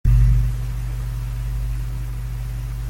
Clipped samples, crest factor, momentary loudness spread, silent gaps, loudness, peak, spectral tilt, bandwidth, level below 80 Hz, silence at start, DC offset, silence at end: under 0.1%; 14 dB; 11 LU; none; -24 LUFS; -6 dBFS; -7 dB/octave; 15.5 kHz; -22 dBFS; 0.05 s; under 0.1%; 0 s